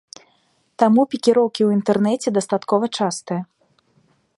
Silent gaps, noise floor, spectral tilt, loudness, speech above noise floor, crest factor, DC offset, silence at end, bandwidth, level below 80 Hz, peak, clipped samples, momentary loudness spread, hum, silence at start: none; -63 dBFS; -5.5 dB/octave; -19 LUFS; 45 dB; 18 dB; under 0.1%; 0.95 s; 11.5 kHz; -68 dBFS; -2 dBFS; under 0.1%; 10 LU; none; 0.8 s